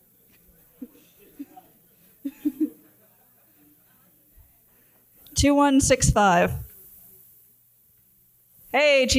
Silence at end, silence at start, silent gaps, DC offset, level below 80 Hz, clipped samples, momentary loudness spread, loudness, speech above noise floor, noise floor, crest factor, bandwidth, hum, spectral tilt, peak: 0 s; 0.8 s; none; under 0.1%; -42 dBFS; under 0.1%; 27 LU; -21 LUFS; 41 dB; -60 dBFS; 20 dB; 16.5 kHz; none; -4 dB/octave; -4 dBFS